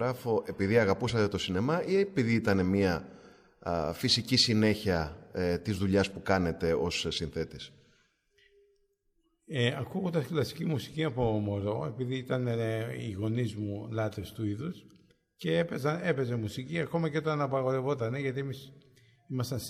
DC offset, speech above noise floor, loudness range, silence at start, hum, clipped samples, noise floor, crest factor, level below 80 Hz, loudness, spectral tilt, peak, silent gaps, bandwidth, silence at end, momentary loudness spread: under 0.1%; 44 dB; 7 LU; 0 s; none; under 0.1%; -74 dBFS; 20 dB; -56 dBFS; -31 LUFS; -5.5 dB/octave; -12 dBFS; none; 15.5 kHz; 0 s; 10 LU